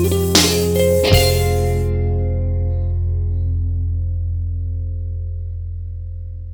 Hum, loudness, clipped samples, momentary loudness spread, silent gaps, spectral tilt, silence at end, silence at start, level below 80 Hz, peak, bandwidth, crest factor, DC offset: none; -18 LUFS; under 0.1%; 15 LU; none; -4.5 dB/octave; 0 s; 0 s; -24 dBFS; 0 dBFS; over 20 kHz; 18 dB; under 0.1%